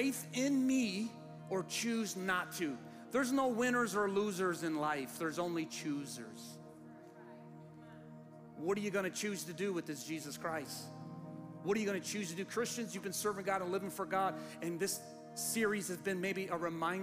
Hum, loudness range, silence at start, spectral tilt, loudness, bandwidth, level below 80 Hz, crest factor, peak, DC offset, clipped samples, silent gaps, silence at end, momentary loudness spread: none; 7 LU; 0 s; -4 dB/octave; -38 LUFS; 15.5 kHz; -76 dBFS; 16 dB; -22 dBFS; under 0.1%; under 0.1%; none; 0 s; 20 LU